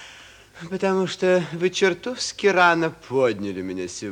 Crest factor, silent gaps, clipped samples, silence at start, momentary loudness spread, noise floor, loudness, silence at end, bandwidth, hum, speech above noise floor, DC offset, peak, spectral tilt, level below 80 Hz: 18 dB; none; under 0.1%; 0 s; 13 LU; -46 dBFS; -22 LUFS; 0 s; 10.5 kHz; none; 24 dB; under 0.1%; -4 dBFS; -4.5 dB/octave; -60 dBFS